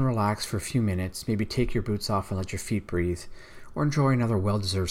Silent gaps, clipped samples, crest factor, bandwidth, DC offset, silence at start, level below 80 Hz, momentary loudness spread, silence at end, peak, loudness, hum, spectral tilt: none; under 0.1%; 14 dB; 16 kHz; under 0.1%; 0 s; -44 dBFS; 8 LU; 0 s; -12 dBFS; -28 LUFS; none; -6 dB/octave